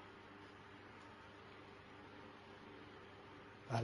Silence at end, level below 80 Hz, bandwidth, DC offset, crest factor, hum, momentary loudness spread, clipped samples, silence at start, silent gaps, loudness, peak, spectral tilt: 0 s; -76 dBFS; 11 kHz; under 0.1%; 28 dB; 50 Hz at -70 dBFS; 1 LU; under 0.1%; 0 s; none; -56 LUFS; -24 dBFS; -6 dB/octave